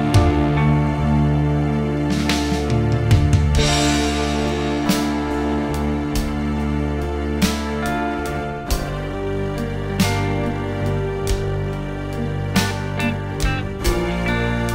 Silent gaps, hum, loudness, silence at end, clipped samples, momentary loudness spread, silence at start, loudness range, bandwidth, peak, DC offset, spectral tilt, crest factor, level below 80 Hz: none; none; -20 LUFS; 0 s; under 0.1%; 8 LU; 0 s; 5 LU; 16 kHz; -2 dBFS; under 0.1%; -5.5 dB/octave; 18 dB; -28 dBFS